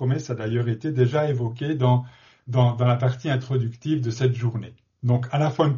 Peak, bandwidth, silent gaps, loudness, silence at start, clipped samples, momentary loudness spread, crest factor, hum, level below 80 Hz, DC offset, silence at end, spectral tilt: -6 dBFS; 7.2 kHz; none; -24 LUFS; 0 s; under 0.1%; 6 LU; 16 dB; none; -58 dBFS; under 0.1%; 0 s; -7.5 dB/octave